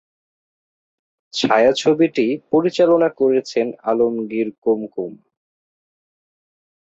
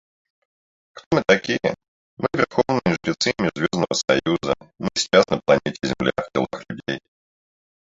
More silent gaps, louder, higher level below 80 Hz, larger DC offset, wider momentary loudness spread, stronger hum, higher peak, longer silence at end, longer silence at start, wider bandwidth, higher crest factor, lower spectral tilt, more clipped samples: second, 4.58-4.62 s vs 1.06-1.11 s, 1.88-2.17 s; first, -18 LUFS vs -21 LUFS; second, -64 dBFS vs -52 dBFS; neither; about the same, 9 LU vs 11 LU; neither; about the same, -2 dBFS vs -2 dBFS; first, 1.7 s vs 0.9 s; first, 1.35 s vs 0.95 s; about the same, 8 kHz vs 7.8 kHz; second, 16 dB vs 22 dB; about the same, -5 dB/octave vs -4.5 dB/octave; neither